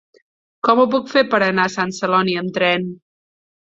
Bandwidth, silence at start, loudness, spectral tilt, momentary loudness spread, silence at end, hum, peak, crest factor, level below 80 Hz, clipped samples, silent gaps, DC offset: 7.8 kHz; 0.65 s; -17 LUFS; -5 dB/octave; 6 LU; 0.65 s; none; -2 dBFS; 18 dB; -62 dBFS; under 0.1%; none; under 0.1%